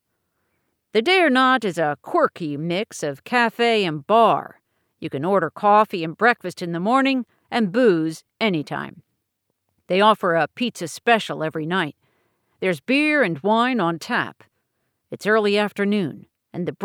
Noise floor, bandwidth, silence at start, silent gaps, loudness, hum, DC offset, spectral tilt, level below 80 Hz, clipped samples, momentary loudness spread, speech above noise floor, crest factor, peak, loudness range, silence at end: -76 dBFS; 17.5 kHz; 0.95 s; none; -20 LUFS; none; under 0.1%; -5 dB/octave; -76 dBFS; under 0.1%; 12 LU; 56 dB; 18 dB; -4 dBFS; 3 LU; 0 s